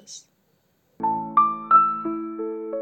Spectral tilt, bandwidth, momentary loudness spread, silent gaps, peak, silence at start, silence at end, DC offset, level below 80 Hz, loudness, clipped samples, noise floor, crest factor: -5.5 dB/octave; 8.8 kHz; 15 LU; none; -6 dBFS; 0.1 s; 0 s; under 0.1%; -74 dBFS; -22 LUFS; under 0.1%; -66 dBFS; 18 dB